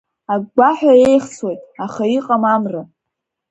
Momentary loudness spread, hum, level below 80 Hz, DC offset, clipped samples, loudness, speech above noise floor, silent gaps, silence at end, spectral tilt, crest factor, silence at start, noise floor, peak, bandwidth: 15 LU; none; -58 dBFS; under 0.1%; under 0.1%; -15 LUFS; 65 dB; none; 0.65 s; -6 dB/octave; 16 dB; 0.3 s; -79 dBFS; 0 dBFS; 9.4 kHz